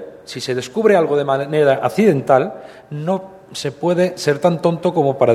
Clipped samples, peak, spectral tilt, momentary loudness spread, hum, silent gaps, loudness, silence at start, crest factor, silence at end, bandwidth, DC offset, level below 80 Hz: under 0.1%; 0 dBFS; -6 dB/octave; 12 LU; none; none; -17 LUFS; 0 s; 16 dB; 0 s; 15 kHz; under 0.1%; -60 dBFS